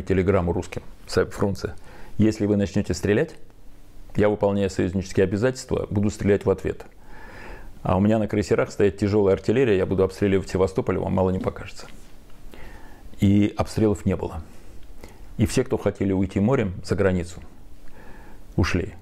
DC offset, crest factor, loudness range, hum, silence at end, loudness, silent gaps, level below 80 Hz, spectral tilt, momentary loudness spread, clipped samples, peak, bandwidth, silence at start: under 0.1%; 14 dB; 4 LU; none; 0 s; -23 LUFS; none; -42 dBFS; -7 dB/octave; 16 LU; under 0.1%; -8 dBFS; 14 kHz; 0 s